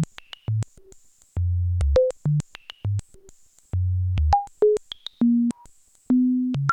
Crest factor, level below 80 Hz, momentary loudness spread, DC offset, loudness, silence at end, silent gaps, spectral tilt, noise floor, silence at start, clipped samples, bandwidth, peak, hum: 16 dB; -34 dBFS; 14 LU; under 0.1%; -24 LUFS; 0 s; none; -8 dB/octave; -52 dBFS; 0 s; under 0.1%; 9.8 kHz; -8 dBFS; none